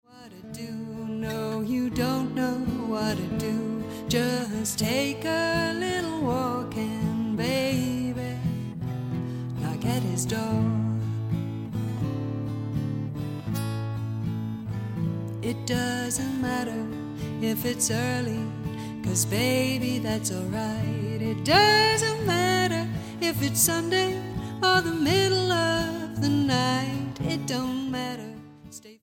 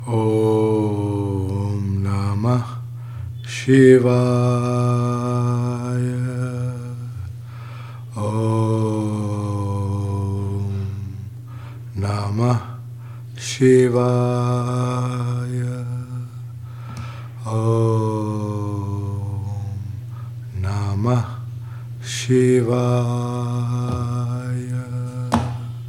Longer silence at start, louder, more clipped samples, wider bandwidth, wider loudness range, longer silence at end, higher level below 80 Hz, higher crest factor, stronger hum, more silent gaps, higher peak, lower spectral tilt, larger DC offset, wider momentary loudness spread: about the same, 0.1 s vs 0 s; second, -27 LUFS vs -21 LUFS; neither; first, 17 kHz vs 11.5 kHz; about the same, 7 LU vs 8 LU; about the same, 0.05 s vs 0 s; about the same, -50 dBFS vs -54 dBFS; about the same, 22 dB vs 20 dB; neither; neither; second, -6 dBFS vs 0 dBFS; second, -4.5 dB/octave vs -7.5 dB/octave; second, under 0.1% vs 0.1%; second, 10 LU vs 15 LU